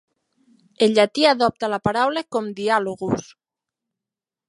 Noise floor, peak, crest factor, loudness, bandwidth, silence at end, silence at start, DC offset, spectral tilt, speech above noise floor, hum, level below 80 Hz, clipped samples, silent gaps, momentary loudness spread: -89 dBFS; -2 dBFS; 20 dB; -20 LUFS; 11.5 kHz; 1.25 s; 0.8 s; under 0.1%; -4.5 dB/octave; 69 dB; none; -58 dBFS; under 0.1%; none; 9 LU